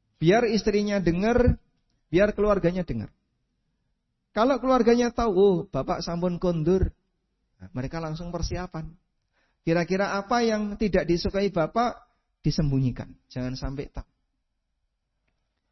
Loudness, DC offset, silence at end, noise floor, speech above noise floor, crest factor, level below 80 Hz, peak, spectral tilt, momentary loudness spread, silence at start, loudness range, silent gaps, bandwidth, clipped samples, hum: -25 LUFS; under 0.1%; 1.7 s; -77 dBFS; 53 dB; 18 dB; -40 dBFS; -8 dBFS; -6.5 dB/octave; 13 LU; 0.2 s; 8 LU; none; 6.2 kHz; under 0.1%; none